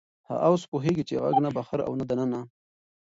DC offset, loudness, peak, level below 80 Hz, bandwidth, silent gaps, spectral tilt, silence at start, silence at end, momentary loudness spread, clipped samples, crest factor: under 0.1%; -27 LUFS; -10 dBFS; -62 dBFS; 8 kHz; 0.68-0.72 s; -7.5 dB/octave; 0.3 s; 0.6 s; 9 LU; under 0.1%; 18 dB